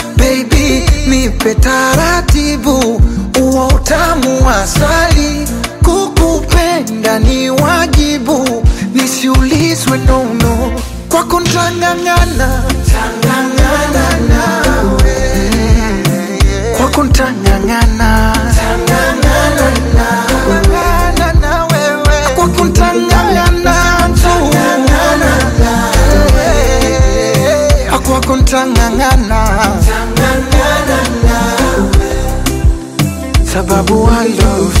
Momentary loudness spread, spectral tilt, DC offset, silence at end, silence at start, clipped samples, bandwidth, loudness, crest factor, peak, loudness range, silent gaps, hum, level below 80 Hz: 3 LU; -5 dB/octave; under 0.1%; 0 s; 0 s; under 0.1%; 16.5 kHz; -10 LUFS; 10 dB; 0 dBFS; 2 LU; none; none; -14 dBFS